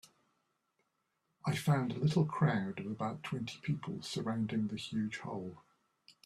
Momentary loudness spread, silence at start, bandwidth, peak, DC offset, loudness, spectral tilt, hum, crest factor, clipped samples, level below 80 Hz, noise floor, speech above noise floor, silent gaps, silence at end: 9 LU; 1.45 s; 13.5 kHz; -18 dBFS; under 0.1%; -36 LUFS; -6.5 dB/octave; none; 18 dB; under 0.1%; -70 dBFS; -82 dBFS; 47 dB; none; 0.15 s